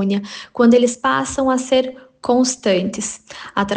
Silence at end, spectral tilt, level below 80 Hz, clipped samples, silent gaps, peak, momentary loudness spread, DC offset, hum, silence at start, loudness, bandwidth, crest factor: 0 s; -4 dB/octave; -52 dBFS; under 0.1%; none; -4 dBFS; 14 LU; under 0.1%; none; 0 s; -18 LUFS; 10 kHz; 14 dB